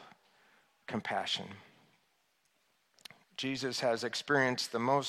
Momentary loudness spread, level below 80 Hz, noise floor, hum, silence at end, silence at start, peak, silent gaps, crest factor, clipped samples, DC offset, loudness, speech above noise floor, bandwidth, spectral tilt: 24 LU; -80 dBFS; -75 dBFS; none; 0 s; 0 s; -16 dBFS; none; 20 dB; under 0.1%; under 0.1%; -34 LUFS; 42 dB; 15 kHz; -3.5 dB/octave